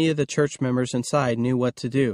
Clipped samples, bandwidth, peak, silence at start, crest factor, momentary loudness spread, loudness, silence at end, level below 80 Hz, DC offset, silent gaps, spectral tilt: under 0.1%; 12.5 kHz; -8 dBFS; 0 s; 16 dB; 2 LU; -23 LUFS; 0 s; -58 dBFS; under 0.1%; none; -6 dB/octave